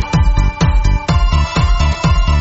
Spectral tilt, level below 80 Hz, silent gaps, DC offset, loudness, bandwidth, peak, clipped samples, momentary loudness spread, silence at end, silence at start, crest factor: -5.5 dB/octave; -14 dBFS; none; under 0.1%; -14 LUFS; 8 kHz; -2 dBFS; under 0.1%; 1 LU; 0 s; 0 s; 10 dB